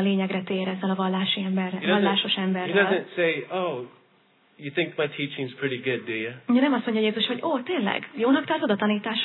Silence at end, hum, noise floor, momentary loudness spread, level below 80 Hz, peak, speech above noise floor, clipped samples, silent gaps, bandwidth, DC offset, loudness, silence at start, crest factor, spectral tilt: 0 s; none; -61 dBFS; 8 LU; -84 dBFS; -8 dBFS; 37 dB; under 0.1%; none; 4.2 kHz; under 0.1%; -25 LUFS; 0 s; 18 dB; -9 dB/octave